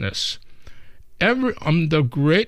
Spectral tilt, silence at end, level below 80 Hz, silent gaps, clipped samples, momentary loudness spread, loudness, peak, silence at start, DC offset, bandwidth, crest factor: -6 dB/octave; 0 s; -46 dBFS; none; under 0.1%; 7 LU; -20 LUFS; -6 dBFS; 0 s; under 0.1%; 12 kHz; 16 dB